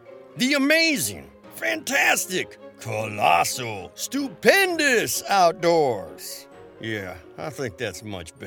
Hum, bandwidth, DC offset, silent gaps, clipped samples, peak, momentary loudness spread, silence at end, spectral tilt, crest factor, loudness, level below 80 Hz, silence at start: none; 19 kHz; under 0.1%; none; under 0.1%; -2 dBFS; 18 LU; 0 s; -3 dB/octave; 22 dB; -22 LUFS; -62 dBFS; 0.1 s